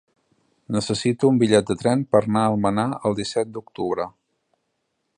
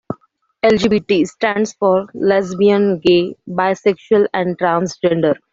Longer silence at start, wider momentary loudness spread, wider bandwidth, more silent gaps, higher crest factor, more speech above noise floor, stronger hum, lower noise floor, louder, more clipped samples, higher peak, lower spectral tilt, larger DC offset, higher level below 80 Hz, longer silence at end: first, 0.7 s vs 0.1 s; first, 10 LU vs 5 LU; first, 10 kHz vs 7.8 kHz; neither; first, 20 dB vs 14 dB; first, 54 dB vs 36 dB; neither; first, -74 dBFS vs -51 dBFS; second, -22 LUFS vs -16 LUFS; neither; about the same, -2 dBFS vs 0 dBFS; about the same, -6 dB/octave vs -6 dB/octave; neither; about the same, -56 dBFS vs -52 dBFS; first, 1.1 s vs 0.2 s